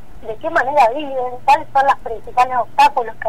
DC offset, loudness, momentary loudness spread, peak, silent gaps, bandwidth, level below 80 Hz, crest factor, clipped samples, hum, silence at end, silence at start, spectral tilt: 4%; -16 LUFS; 9 LU; -4 dBFS; none; 15.5 kHz; -46 dBFS; 12 dB; under 0.1%; none; 0 s; 0.15 s; -3.5 dB/octave